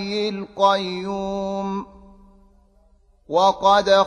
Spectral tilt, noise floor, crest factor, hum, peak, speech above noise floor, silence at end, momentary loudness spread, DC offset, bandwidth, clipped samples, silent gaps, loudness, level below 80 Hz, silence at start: -4.5 dB/octave; -56 dBFS; 18 dB; none; -4 dBFS; 36 dB; 0 s; 12 LU; under 0.1%; 10.5 kHz; under 0.1%; none; -21 LUFS; -52 dBFS; 0 s